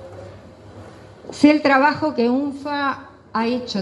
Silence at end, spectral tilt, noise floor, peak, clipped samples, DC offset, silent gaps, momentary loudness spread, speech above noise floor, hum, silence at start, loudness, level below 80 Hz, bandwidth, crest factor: 0 s; -5.5 dB/octave; -41 dBFS; 0 dBFS; under 0.1%; under 0.1%; none; 22 LU; 23 dB; none; 0 s; -19 LUFS; -58 dBFS; 10.5 kHz; 20 dB